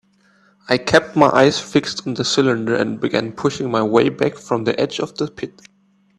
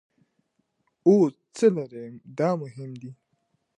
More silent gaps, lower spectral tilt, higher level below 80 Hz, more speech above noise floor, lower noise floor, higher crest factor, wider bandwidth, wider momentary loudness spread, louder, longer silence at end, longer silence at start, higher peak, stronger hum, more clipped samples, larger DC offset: neither; second, -5 dB/octave vs -7.5 dB/octave; first, -54 dBFS vs -80 dBFS; second, 38 dB vs 50 dB; second, -56 dBFS vs -73 dBFS; about the same, 18 dB vs 20 dB; about the same, 11.5 kHz vs 11.5 kHz; second, 10 LU vs 20 LU; first, -18 LUFS vs -24 LUFS; about the same, 0.7 s vs 0.65 s; second, 0.7 s vs 1.05 s; first, 0 dBFS vs -6 dBFS; neither; neither; neither